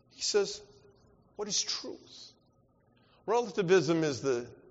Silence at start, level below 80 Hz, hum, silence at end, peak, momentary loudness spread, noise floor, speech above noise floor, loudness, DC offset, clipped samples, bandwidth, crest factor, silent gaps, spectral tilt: 0.2 s; -72 dBFS; none; 0.15 s; -14 dBFS; 18 LU; -68 dBFS; 37 dB; -31 LUFS; under 0.1%; under 0.1%; 8 kHz; 20 dB; none; -3.5 dB/octave